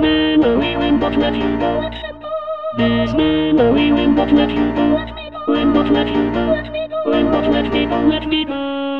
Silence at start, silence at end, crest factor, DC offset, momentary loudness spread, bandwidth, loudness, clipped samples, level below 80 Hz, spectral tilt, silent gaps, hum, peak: 0 s; 0 s; 16 dB; 0.5%; 10 LU; 5.6 kHz; -16 LUFS; under 0.1%; -34 dBFS; -8 dB/octave; none; none; 0 dBFS